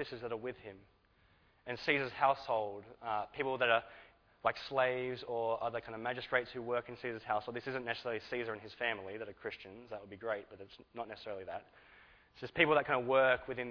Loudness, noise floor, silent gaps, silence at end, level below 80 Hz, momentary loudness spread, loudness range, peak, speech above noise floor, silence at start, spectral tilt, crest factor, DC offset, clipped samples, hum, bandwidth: -36 LUFS; -69 dBFS; none; 0 s; -70 dBFS; 17 LU; 8 LU; -12 dBFS; 32 dB; 0 s; -2 dB/octave; 26 dB; under 0.1%; under 0.1%; none; 5.4 kHz